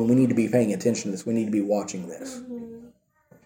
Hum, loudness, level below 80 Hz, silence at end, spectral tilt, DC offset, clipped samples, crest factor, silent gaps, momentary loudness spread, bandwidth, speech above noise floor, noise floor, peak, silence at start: none; -24 LUFS; -66 dBFS; 0.55 s; -6.5 dB/octave; under 0.1%; under 0.1%; 18 dB; none; 17 LU; 16.5 kHz; 35 dB; -59 dBFS; -8 dBFS; 0 s